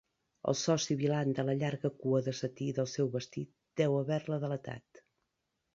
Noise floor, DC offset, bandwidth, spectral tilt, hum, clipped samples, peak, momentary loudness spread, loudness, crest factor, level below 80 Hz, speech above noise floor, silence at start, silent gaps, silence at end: -84 dBFS; under 0.1%; 7.8 kHz; -6 dB/octave; none; under 0.1%; -16 dBFS; 10 LU; -34 LUFS; 18 dB; -72 dBFS; 51 dB; 0.45 s; none; 0.95 s